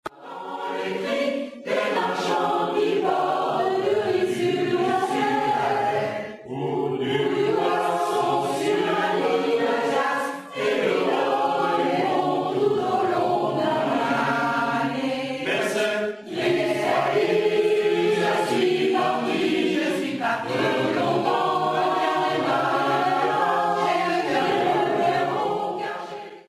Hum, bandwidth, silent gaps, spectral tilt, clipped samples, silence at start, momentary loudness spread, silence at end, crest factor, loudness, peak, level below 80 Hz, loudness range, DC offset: none; 14.5 kHz; none; -5 dB/octave; under 0.1%; 0.05 s; 6 LU; 0.1 s; 14 dB; -23 LUFS; -10 dBFS; -68 dBFS; 2 LU; under 0.1%